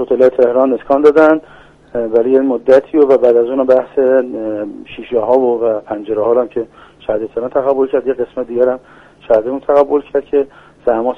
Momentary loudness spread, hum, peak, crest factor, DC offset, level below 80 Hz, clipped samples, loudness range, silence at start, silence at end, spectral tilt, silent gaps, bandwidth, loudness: 11 LU; none; 0 dBFS; 14 dB; under 0.1%; -52 dBFS; under 0.1%; 5 LU; 0 s; 0 s; -7.5 dB/octave; none; 6.4 kHz; -13 LUFS